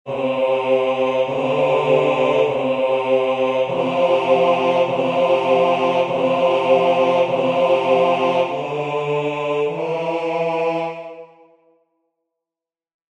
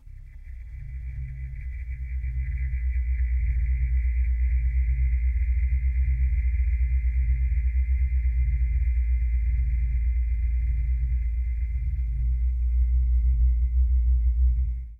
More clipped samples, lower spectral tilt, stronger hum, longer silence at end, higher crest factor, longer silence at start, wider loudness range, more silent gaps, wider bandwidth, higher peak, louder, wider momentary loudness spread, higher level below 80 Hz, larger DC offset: neither; second, -6 dB/octave vs -9.5 dB/octave; neither; first, 1.85 s vs 0.05 s; first, 16 dB vs 10 dB; about the same, 0.05 s vs 0.05 s; first, 7 LU vs 4 LU; neither; first, 8.4 kHz vs 2.6 kHz; first, -4 dBFS vs -14 dBFS; first, -18 LUFS vs -27 LUFS; second, 6 LU vs 12 LU; second, -60 dBFS vs -24 dBFS; neither